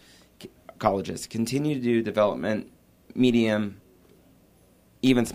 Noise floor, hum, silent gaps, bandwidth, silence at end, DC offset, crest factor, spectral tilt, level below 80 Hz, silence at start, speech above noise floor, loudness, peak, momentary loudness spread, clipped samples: -59 dBFS; none; none; 15.5 kHz; 0 s; under 0.1%; 20 dB; -6 dB/octave; -58 dBFS; 0.4 s; 35 dB; -25 LUFS; -6 dBFS; 14 LU; under 0.1%